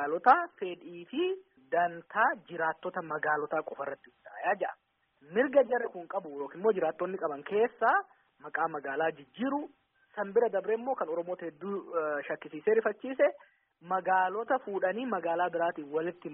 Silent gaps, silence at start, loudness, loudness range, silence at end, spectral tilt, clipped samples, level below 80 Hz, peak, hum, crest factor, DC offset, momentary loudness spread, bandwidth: none; 0 s; -31 LUFS; 3 LU; 0 s; 1 dB/octave; under 0.1%; -82 dBFS; -10 dBFS; none; 22 dB; under 0.1%; 12 LU; 3.8 kHz